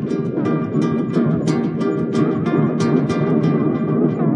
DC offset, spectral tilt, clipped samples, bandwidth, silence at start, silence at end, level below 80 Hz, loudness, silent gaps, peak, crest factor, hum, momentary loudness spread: under 0.1%; -8.5 dB/octave; under 0.1%; 10.5 kHz; 0 s; 0 s; -58 dBFS; -18 LUFS; none; -4 dBFS; 14 dB; none; 3 LU